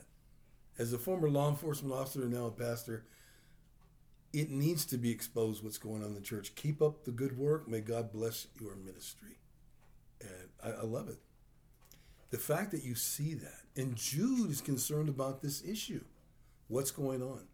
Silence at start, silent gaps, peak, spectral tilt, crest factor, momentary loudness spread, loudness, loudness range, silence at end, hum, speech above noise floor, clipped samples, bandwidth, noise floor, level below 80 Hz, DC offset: 0 s; none; -18 dBFS; -5.5 dB/octave; 20 dB; 14 LU; -38 LUFS; 8 LU; 0.05 s; none; 27 dB; under 0.1%; over 20 kHz; -64 dBFS; -66 dBFS; under 0.1%